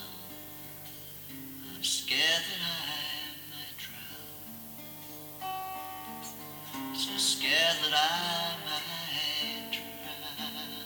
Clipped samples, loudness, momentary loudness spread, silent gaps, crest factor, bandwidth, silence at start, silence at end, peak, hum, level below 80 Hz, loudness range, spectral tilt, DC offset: under 0.1%; -31 LUFS; 17 LU; none; 22 dB; over 20 kHz; 0 s; 0 s; -12 dBFS; 50 Hz at -60 dBFS; -70 dBFS; 11 LU; -1 dB/octave; under 0.1%